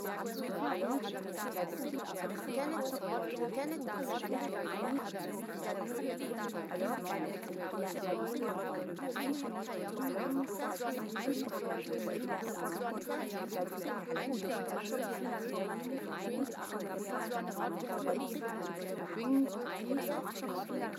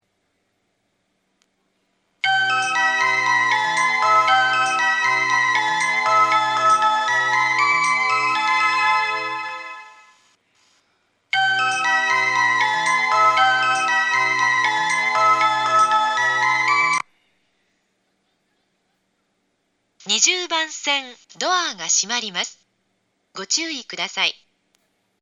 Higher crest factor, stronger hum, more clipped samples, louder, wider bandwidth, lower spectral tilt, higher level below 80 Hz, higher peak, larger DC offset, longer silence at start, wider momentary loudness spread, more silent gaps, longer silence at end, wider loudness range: about the same, 16 dB vs 18 dB; neither; neither; second, -38 LUFS vs -18 LUFS; first, 16.5 kHz vs 12 kHz; first, -5 dB/octave vs 0 dB/octave; about the same, -88 dBFS vs -84 dBFS; second, -22 dBFS vs -2 dBFS; neither; second, 0 s vs 2.25 s; second, 4 LU vs 9 LU; neither; second, 0 s vs 0.9 s; second, 1 LU vs 6 LU